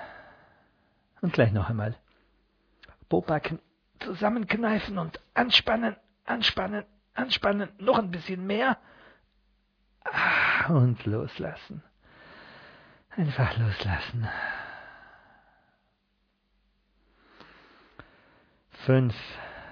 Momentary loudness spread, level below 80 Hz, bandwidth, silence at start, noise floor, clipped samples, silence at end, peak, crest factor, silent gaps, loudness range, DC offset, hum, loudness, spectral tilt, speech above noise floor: 19 LU; -54 dBFS; 5.4 kHz; 0 s; -73 dBFS; under 0.1%; 0 s; -6 dBFS; 24 dB; none; 6 LU; under 0.1%; none; -27 LUFS; -7 dB/octave; 46 dB